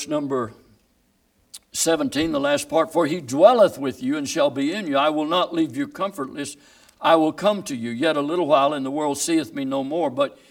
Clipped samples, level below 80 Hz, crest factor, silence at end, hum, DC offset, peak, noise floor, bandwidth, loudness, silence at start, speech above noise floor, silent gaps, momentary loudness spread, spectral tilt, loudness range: under 0.1%; -60 dBFS; 20 dB; 0.15 s; none; under 0.1%; -2 dBFS; -64 dBFS; 17.5 kHz; -21 LUFS; 0 s; 43 dB; none; 9 LU; -4 dB/octave; 4 LU